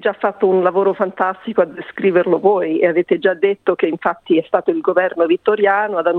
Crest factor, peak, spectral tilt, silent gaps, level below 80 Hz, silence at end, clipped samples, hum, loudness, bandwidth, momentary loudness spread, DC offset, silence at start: 14 dB; -2 dBFS; -8.5 dB/octave; none; -64 dBFS; 0 s; under 0.1%; none; -16 LUFS; 4.2 kHz; 4 LU; under 0.1%; 0 s